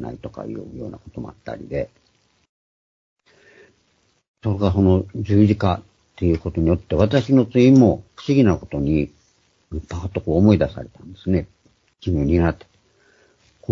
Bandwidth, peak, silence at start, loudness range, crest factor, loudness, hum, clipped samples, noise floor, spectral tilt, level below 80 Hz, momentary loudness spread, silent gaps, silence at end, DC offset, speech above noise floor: 7.4 kHz; -2 dBFS; 0 s; 17 LU; 18 dB; -19 LUFS; none; under 0.1%; -64 dBFS; -8.5 dB/octave; -38 dBFS; 19 LU; 2.49-3.17 s, 4.28-4.34 s; 0 s; under 0.1%; 45 dB